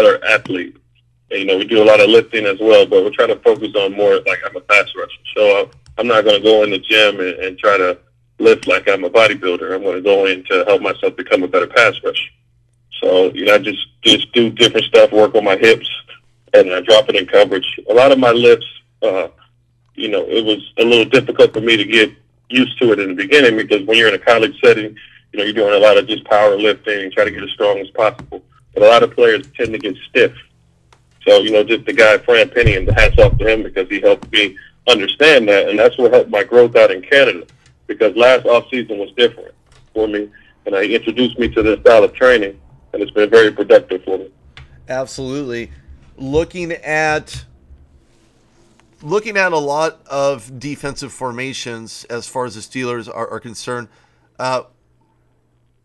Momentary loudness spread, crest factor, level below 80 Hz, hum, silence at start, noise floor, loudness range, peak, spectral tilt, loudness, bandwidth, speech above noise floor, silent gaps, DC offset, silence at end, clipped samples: 15 LU; 14 dB; -34 dBFS; none; 0 s; -58 dBFS; 10 LU; 0 dBFS; -4.5 dB/octave; -13 LUFS; 12 kHz; 45 dB; none; under 0.1%; 1.25 s; under 0.1%